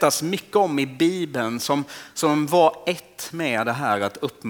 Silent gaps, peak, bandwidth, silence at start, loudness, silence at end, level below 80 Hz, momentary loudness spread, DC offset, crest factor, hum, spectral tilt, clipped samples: none; -4 dBFS; over 20 kHz; 0 s; -22 LUFS; 0 s; -68 dBFS; 9 LU; under 0.1%; 18 dB; none; -4.5 dB/octave; under 0.1%